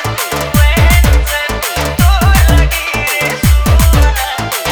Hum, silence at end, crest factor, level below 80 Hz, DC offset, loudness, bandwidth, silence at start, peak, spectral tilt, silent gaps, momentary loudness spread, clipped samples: none; 0 s; 10 dB; -12 dBFS; under 0.1%; -11 LUFS; over 20 kHz; 0 s; 0 dBFS; -4.5 dB/octave; none; 7 LU; under 0.1%